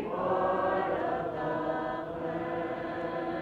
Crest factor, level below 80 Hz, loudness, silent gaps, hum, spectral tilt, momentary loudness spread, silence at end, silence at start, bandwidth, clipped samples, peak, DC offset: 14 dB; -60 dBFS; -32 LUFS; none; none; -8 dB/octave; 6 LU; 0 s; 0 s; 7.8 kHz; under 0.1%; -18 dBFS; under 0.1%